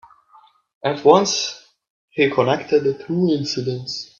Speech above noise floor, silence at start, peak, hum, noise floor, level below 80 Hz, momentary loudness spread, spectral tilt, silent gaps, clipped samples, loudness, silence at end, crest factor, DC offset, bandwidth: 34 dB; 0.85 s; 0 dBFS; none; -53 dBFS; -62 dBFS; 13 LU; -4.5 dB/octave; 1.90-2.08 s; under 0.1%; -19 LUFS; 0.15 s; 20 dB; under 0.1%; 7.4 kHz